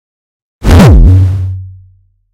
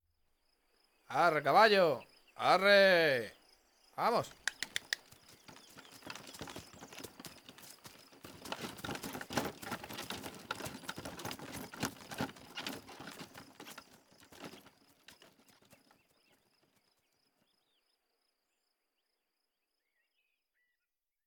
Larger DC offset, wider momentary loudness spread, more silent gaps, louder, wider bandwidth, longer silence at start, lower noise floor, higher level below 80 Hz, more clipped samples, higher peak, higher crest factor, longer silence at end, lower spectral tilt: neither; second, 15 LU vs 26 LU; neither; first, -6 LUFS vs -33 LUFS; second, 15 kHz vs over 20 kHz; second, 0.6 s vs 1.1 s; second, -45 dBFS vs under -90 dBFS; first, -12 dBFS vs -72 dBFS; first, 6% vs under 0.1%; first, 0 dBFS vs -12 dBFS; second, 8 dB vs 24 dB; second, 0.65 s vs 6.7 s; first, -7.5 dB/octave vs -3.5 dB/octave